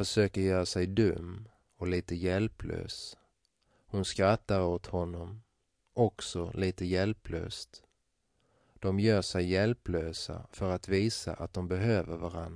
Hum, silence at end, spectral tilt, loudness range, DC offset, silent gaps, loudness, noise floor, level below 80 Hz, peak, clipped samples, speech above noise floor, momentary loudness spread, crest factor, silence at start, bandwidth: none; 0 s; -6 dB/octave; 3 LU; under 0.1%; none; -32 LUFS; -78 dBFS; -52 dBFS; -12 dBFS; under 0.1%; 46 dB; 12 LU; 20 dB; 0 s; 11 kHz